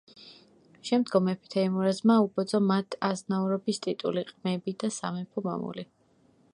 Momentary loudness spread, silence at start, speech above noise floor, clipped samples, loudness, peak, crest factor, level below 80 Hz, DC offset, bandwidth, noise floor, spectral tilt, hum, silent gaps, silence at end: 10 LU; 0.15 s; 36 dB; under 0.1%; -28 LUFS; -10 dBFS; 18 dB; -76 dBFS; under 0.1%; 11 kHz; -64 dBFS; -6 dB/octave; none; none; 0.7 s